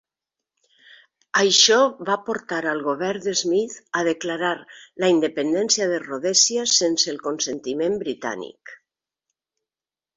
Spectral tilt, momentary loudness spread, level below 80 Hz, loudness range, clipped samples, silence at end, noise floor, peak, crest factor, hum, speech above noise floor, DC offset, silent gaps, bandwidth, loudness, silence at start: -1.5 dB/octave; 11 LU; -68 dBFS; 4 LU; under 0.1%; 1.4 s; under -90 dBFS; -2 dBFS; 20 dB; none; over 68 dB; under 0.1%; none; 8 kHz; -21 LUFS; 1.35 s